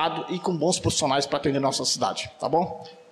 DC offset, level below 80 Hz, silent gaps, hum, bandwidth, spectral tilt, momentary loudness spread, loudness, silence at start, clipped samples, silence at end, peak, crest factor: under 0.1%; -54 dBFS; none; none; 14.5 kHz; -3.5 dB/octave; 6 LU; -25 LUFS; 0 s; under 0.1%; 0.1 s; -12 dBFS; 14 dB